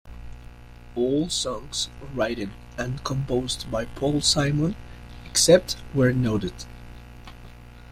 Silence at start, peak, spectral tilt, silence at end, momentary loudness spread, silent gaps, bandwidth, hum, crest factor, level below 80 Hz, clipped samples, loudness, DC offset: 0.05 s; -4 dBFS; -4 dB/octave; 0 s; 24 LU; none; 16 kHz; 60 Hz at -40 dBFS; 22 dB; -42 dBFS; under 0.1%; -24 LUFS; under 0.1%